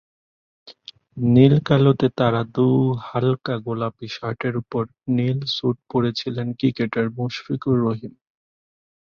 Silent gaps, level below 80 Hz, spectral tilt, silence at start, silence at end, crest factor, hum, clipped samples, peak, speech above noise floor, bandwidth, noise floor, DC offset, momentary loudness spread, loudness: none; -56 dBFS; -8.5 dB/octave; 0.65 s; 0.95 s; 20 dB; none; under 0.1%; -2 dBFS; 25 dB; 6.8 kHz; -45 dBFS; under 0.1%; 12 LU; -21 LUFS